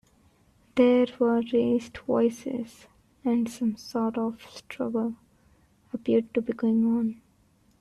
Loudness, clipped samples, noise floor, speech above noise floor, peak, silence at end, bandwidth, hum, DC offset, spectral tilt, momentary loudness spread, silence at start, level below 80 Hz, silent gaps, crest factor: -27 LUFS; under 0.1%; -63 dBFS; 38 dB; -8 dBFS; 0.7 s; 12 kHz; none; under 0.1%; -6.5 dB/octave; 12 LU; 0.75 s; -64 dBFS; none; 18 dB